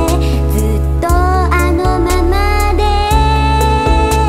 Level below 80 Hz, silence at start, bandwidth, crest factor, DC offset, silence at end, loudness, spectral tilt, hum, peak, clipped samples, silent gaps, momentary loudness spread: -14 dBFS; 0 s; 16 kHz; 10 dB; 1%; 0 s; -13 LUFS; -6 dB/octave; none; 0 dBFS; under 0.1%; none; 2 LU